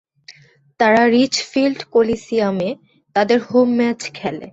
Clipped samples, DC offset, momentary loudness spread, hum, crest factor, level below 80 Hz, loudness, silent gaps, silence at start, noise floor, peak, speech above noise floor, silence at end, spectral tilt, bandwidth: under 0.1%; under 0.1%; 12 LU; none; 16 dB; -56 dBFS; -17 LUFS; none; 0.3 s; -49 dBFS; -2 dBFS; 33 dB; 0.05 s; -4.5 dB/octave; 8 kHz